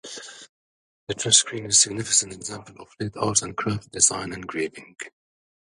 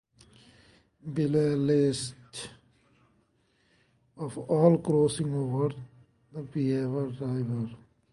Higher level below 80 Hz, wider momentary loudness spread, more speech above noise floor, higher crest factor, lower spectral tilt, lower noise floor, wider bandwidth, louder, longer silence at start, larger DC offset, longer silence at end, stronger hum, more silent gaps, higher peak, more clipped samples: first, -56 dBFS vs -64 dBFS; first, 21 LU vs 18 LU; first, over 65 dB vs 42 dB; about the same, 26 dB vs 22 dB; second, -1.5 dB/octave vs -7 dB/octave; first, under -90 dBFS vs -69 dBFS; about the same, 11.5 kHz vs 11.5 kHz; first, -21 LUFS vs -28 LUFS; second, 0.05 s vs 1.05 s; neither; first, 0.55 s vs 0.35 s; neither; first, 0.49-1.07 s vs none; first, 0 dBFS vs -8 dBFS; neither